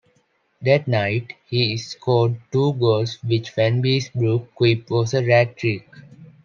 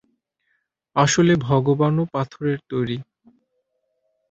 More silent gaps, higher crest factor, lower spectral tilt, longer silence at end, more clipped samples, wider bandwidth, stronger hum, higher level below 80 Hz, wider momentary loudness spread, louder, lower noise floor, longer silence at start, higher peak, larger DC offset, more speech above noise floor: neither; about the same, 18 dB vs 20 dB; about the same, -6.5 dB/octave vs -5.5 dB/octave; second, 0.2 s vs 1.3 s; neither; second, 7.2 kHz vs 8.2 kHz; neither; second, -62 dBFS vs -54 dBFS; second, 7 LU vs 10 LU; about the same, -20 LUFS vs -20 LUFS; second, -64 dBFS vs -73 dBFS; second, 0.6 s vs 0.95 s; about the same, -2 dBFS vs -2 dBFS; neither; second, 45 dB vs 53 dB